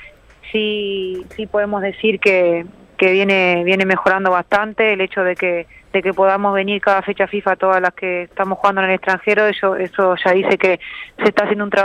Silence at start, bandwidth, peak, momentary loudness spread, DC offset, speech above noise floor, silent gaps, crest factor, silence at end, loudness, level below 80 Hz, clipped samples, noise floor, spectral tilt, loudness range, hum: 0 s; 10 kHz; -2 dBFS; 8 LU; under 0.1%; 24 dB; none; 14 dB; 0 s; -16 LUFS; -54 dBFS; under 0.1%; -40 dBFS; -6 dB/octave; 2 LU; none